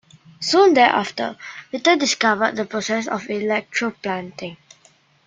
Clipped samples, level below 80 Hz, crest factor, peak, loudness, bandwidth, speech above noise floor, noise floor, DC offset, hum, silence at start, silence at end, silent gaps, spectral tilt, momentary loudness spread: under 0.1%; -66 dBFS; 20 dB; -2 dBFS; -19 LUFS; 9.4 kHz; 36 dB; -56 dBFS; under 0.1%; none; 0.4 s; 0.7 s; none; -3 dB/octave; 16 LU